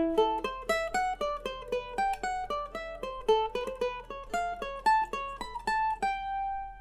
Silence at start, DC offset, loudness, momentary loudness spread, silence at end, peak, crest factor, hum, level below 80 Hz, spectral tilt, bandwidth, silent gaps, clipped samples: 0 s; under 0.1%; -32 LUFS; 9 LU; 0 s; -14 dBFS; 16 dB; none; -50 dBFS; -3.5 dB/octave; 15.5 kHz; none; under 0.1%